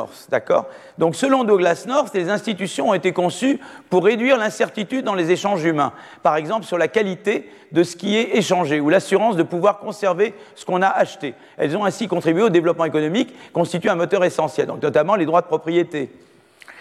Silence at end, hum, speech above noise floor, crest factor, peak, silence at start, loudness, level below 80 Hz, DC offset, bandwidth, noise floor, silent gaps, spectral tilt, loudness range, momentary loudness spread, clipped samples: 0 s; none; 26 dB; 16 dB; -4 dBFS; 0 s; -19 LUFS; -70 dBFS; under 0.1%; 13.5 kHz; -45 dBFS; none; -5.5 dB/octave; 1 LU; 7 LU; under 0.1%